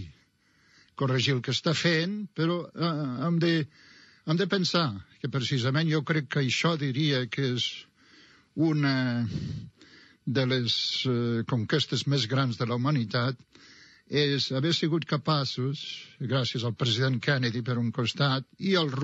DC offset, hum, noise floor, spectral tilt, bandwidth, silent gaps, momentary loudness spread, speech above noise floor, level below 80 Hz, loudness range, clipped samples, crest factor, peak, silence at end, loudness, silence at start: under 0.1%; none; -65 dBFS; -5.5 dB/octave; 8 kHz; none; 7 LU; 38 dB; -66 dBFS; 2 LU; under 0.1%; 18 dB; -12 dBFS; 0 s; -28 LUFS; 0 s